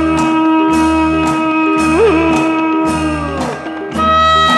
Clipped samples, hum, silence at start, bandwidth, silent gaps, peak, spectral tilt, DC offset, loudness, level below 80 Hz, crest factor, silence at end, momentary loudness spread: under 0.1%; none; 0 s; 12 kHz; none; -2 dBFS; -5 dB/octave; under 0.1%; -12 LUFS; -32 dBFS; 10 dB; 0 s; 8 LU